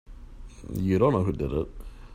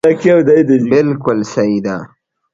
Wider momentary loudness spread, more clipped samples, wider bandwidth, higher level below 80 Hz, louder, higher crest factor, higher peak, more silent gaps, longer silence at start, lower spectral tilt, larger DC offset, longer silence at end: first, 20 LU vs 9 LU; neither; first, 16 kHz vs 7.8 kHz; first, -42 dBFS vs -52 dBFS; second, -26 LUFS vs -12 LUFS; first, 18 dB vs 12 dB; second, -10 dBFS vs 0 dBFS; neither; about the same, 0.1 s vs 0.05 s; first, -9 dB/octave vs -7.5 dB/octave; neither; second, 0 s vs 0.45 s